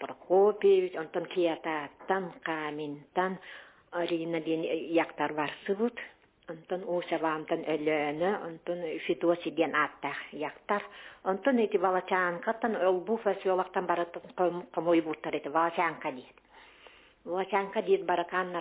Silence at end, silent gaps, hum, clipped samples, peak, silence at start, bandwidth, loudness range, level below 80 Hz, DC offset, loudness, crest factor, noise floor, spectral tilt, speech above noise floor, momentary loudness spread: 0 s; none; none; under 0.1%; -12 dBFS; 0 s; 4 kHz; 3 LU; -74 dBFS; under 0.1%; -31 LUFS; 18 dB; -57 dBFS; -3.5 dB/octave; 27 dB; 10 LU